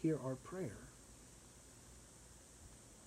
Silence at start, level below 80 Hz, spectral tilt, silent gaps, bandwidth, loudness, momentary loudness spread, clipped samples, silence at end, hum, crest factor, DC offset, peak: 0 s; -66 dBFS; -6.5 dB/octave; none; 15.5 kHz; -50 LUFS; 16 LU; under 0.1%; 0 s; none; 20 dB; under 0.1%; -28 dBFS